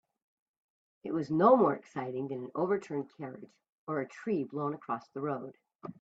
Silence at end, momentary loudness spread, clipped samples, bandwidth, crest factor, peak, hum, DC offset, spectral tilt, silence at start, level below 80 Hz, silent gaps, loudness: 0.1 s; 22 LU; under 0.1%; 8 kHz; 22 dB; -12 dBFS; none; under 0.1%; -8.5 dB/octave; 1.05 s; -78 dBFS; 3.72-3.87 s; -32 LUFS